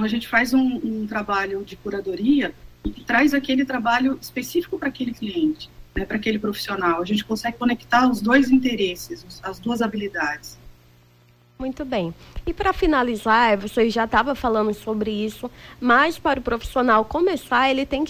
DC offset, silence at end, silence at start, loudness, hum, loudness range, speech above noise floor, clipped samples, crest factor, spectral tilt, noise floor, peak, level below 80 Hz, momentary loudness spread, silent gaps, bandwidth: under 0.1%; 0 s; 0 s; -21 LUFS; none; 5 LU; 33 dB; under 0.1%; 16 dB; -5 dB/octave; -55 dBFS; -6 dBFS; -42 dBFS; 14 LU; none; 16 kHz